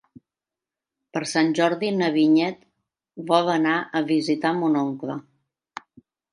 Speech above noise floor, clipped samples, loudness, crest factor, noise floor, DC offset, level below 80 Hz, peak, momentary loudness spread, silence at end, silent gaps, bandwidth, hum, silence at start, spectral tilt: 68 dB; under 0.1%; -22 LUFS; 20 dB; -89 dBFS; under 0.1%; -76 dBFS; -4 dBFS; 18 LU; 1.15 s; none; 11 kHz; none; 1.15 s; -5.5 dB/octave